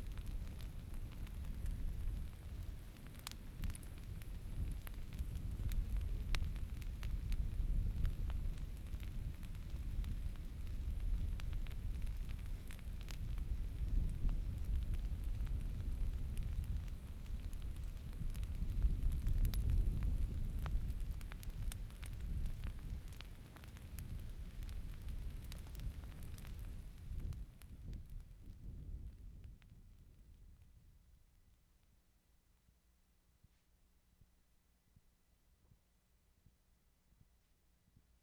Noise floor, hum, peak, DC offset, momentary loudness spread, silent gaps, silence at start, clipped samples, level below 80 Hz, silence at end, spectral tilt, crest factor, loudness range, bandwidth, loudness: -75 dBFS; none; -20 dBFS; under 0.1%; 12 LU; none; 0 s; under 0.1%; -44 dBFS; 2.5 s; -6 dB/octave; 24 dB; 11 LU; 15 kHz; -47 LUFS